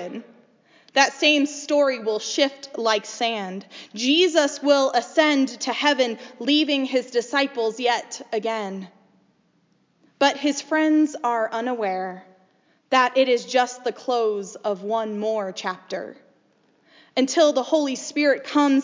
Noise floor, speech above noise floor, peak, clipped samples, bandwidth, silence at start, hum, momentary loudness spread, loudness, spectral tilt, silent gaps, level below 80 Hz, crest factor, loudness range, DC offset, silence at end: -64 dBFS; 42 dB; -4 dBFS; under 0.1%; 7.6 kHz; 0 s; none; 11 LU; -22 LUFS; -2.5 dB/octave; none; -84 dBFS; 20 dB; 5 LU; under 0.1%; 0 s